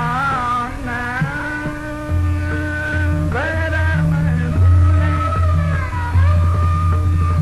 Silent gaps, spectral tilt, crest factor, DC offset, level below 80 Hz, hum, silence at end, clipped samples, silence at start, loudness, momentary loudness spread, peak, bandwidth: none; -7.5 dB/octave; 12 dB; under 0.1%; -20 dBFS; none; 0 s; under 0.1%; 0 s; -18 LUFS; 8 LU; -4 dBFS; 11.5 kHz